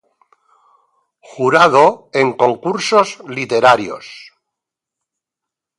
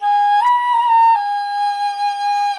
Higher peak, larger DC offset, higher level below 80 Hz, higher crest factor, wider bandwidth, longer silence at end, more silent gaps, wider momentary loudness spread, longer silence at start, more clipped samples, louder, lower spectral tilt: first, 0 dBFS vs -6 dBFS; neither; first, -64 dBFS vs -72 dBFS; first, 16 dB vs 10 dB; about the same, 11.5 kHz vs 11 kHz; first, 1.6 s vs 0 s; neither; first, 15 LU vs 7 LU; first, 1.35 s vs 0 s; neither; about the same, -14 LUFS vs -15 LUFS; first, -4.5 dB/octave vs 3 dB/octave